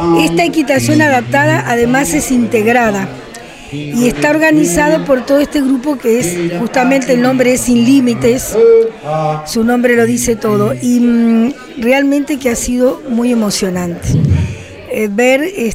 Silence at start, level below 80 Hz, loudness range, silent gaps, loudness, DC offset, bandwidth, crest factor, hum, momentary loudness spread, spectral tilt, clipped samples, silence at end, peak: 0 s; -36 dBFS; 3 LU; none; -12 LUFS; under 0.1%; 16 kHz; 10 dB; none; 7 LU; -5 dB/octave; under 0.1%; 0 s; 0 dBFS